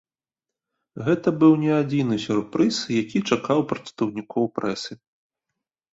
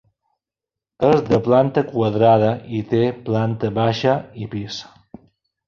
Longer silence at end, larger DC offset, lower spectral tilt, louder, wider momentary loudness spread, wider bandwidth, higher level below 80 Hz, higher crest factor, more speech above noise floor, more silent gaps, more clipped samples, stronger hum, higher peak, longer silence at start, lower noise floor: first, 1 s vs 0.85 s; neither; second, -6 dB/octave vs -7.5 dB/octave; second, -23 LUFS vs -19 LUFS; second, 11 LU vs 14 LU; first, 8 kHz vs 7.2 kHz; second, -62 dBFS vs -52 dBFS; about the same, 20 dB vs 18 dB; about the same, 67 dB vs 69 dB; neither; neither; neither; about the same, -4 dBFS vs -2 dBFS; about the same, 0.95 s vs 1 s; about the same, -89 dBFS vs -87 dBFS